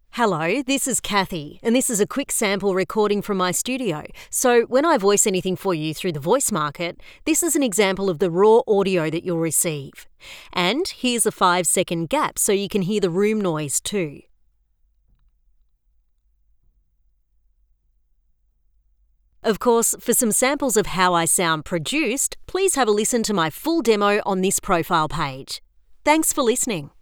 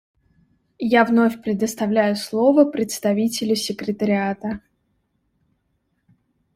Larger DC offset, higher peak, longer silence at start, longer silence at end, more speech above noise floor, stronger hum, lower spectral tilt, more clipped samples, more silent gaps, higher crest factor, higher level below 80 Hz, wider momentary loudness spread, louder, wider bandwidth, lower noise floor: neither; about the same, -2 dBFS vs -4 dBFS; second, 0.15 s vs 0.8 s; second, 0.15 s vs 1.95 s; second, 43 dB vs 51 dB; neither; second, -3.5 dB/octave vs -5 dB/octave; neither; neither; about the same, 18 dB vs 18 dB; first, -50 dBFS vs -60 dBFS; about the same, 8 LU vs 10 LU; about the same, -20 LUFS vs -20 LUFS; first, over 20 kHz vs 16 kHz; second, -63 dBFS vs -70 dBFS